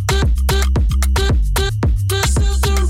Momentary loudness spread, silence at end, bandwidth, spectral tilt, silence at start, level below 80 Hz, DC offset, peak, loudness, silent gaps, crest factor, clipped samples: 2 LU; 0 s; 16.5 kHz; -4.5 dB/octave; 0 s; -16 dBFS; under 0.1%; -8 dBFS; -17 LUFS; none; 8 dB; under 0.1%